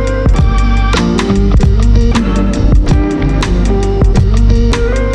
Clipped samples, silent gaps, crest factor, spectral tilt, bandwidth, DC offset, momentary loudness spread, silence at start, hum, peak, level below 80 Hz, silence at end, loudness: under 0.1%; none; 8 dB; -7 dB/octave; 9.2 kHz; under 0.1%; 3 LU; 0 s; none; 0 dBFS; -10 dBFS; 0 s; -11 LUFS